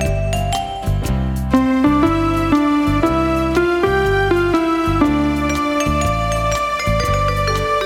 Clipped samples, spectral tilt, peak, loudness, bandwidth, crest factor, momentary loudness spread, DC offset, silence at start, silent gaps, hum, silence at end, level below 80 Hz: under 0.1%; -6 dB/octave; -2 dBFS; -17 LUFS; 16.5 kHz; 14 dB; 5 LU; under 0.1%; 0 s; none; none; 0 s; -26 dBFS